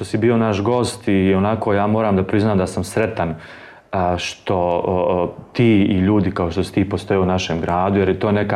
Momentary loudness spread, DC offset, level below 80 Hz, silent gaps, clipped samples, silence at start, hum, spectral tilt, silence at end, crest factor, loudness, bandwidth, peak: 6 LU; under 0.1%; -44 dBFS; none; under 0.1%; 0 s; none; -7 dB/octave; 0 s; 14 dB; -18 LUFS; 12.5 kHz; -4 dBFS